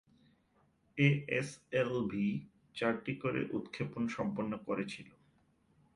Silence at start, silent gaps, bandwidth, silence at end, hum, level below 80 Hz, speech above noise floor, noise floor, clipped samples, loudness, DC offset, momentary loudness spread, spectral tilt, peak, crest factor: 0.95 s; none; 11.5 kHz; 0.85 s; none; -70 dBFS; 37 dB; -72 dBFS; under 0.1%; -36 LUFS; under 0.1%; 12 LU; -7 dB/octave; -16 dBFS; 22 dB